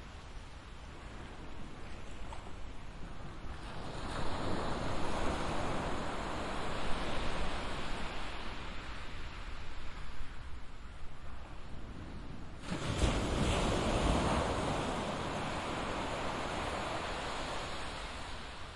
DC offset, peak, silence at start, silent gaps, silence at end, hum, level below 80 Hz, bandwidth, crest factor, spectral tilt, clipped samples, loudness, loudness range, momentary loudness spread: under 0.1%; -16 dBFS; 0 s; none; 0 s; none; -44 dBFS; 11.5 kHz; 20 dB; -5 dB/octave; under 0.1%; -39 LUFS; 14 LU; 17 LU